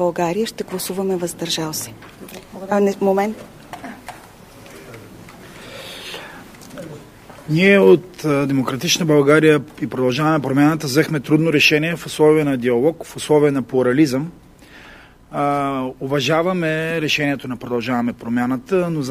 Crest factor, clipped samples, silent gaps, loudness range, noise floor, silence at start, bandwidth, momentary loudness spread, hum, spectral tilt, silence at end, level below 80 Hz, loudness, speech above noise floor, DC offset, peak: 18 dB; under 0.1%; none; 11 LU; -43 dBFS; 0 s; 16 kHz; 23 LU; none; -5 dB/octave; 0 s; -54 dBFS; -18 LUFS; 26 dB; under 0.1%; 0 dBFS